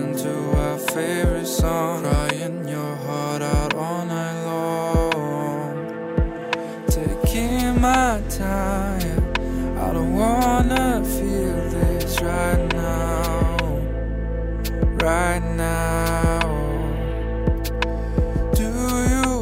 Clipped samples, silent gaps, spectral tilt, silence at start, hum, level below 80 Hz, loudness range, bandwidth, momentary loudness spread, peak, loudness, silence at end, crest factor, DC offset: under 0.1%; none; -5.5 dB/octave; 0 s; none; -26 dBFS; 3 LU; 16 kHz; 7 LU; -8 dBFS; -22 LUFS; 0 s; 14 dB; under 0.1%